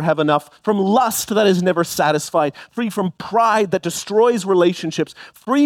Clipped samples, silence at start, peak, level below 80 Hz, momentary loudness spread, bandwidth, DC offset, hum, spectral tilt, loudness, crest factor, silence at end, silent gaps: under 0.1%; 0 s; -2 dBFS; -60 dBFS; 8 LU; 18 kHz; under 0.1%; none; -5 dB/octave; -18 LUFS; 14 dB; 0 s; none